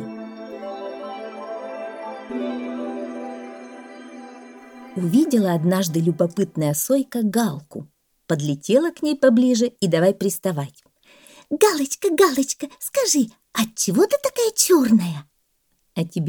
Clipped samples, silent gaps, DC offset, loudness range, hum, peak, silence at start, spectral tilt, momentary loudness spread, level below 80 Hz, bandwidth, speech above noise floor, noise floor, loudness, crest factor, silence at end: under 0.1%; none; under 0.1%; 11 LU; none; -2 dBFS; 0 s; -5 dB/octave; 18 LU; -68 dBFS; over 20 kHz; 48 dB; -68 dBFS; -20 LUFS; 20 dB; 0 s